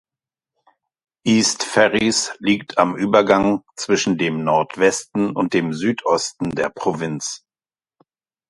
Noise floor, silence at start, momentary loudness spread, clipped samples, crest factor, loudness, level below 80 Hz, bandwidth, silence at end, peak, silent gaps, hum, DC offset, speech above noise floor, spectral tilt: under -90 dBFS; 1.25 s; 9 LU; under 0.1%; 20 dB; -19 LUFS; -56 dBFS; 11.5 kHz; 1.1 s; 0 dBFS; none; none; under 0.1%; over 71 dB; -4 dB/octave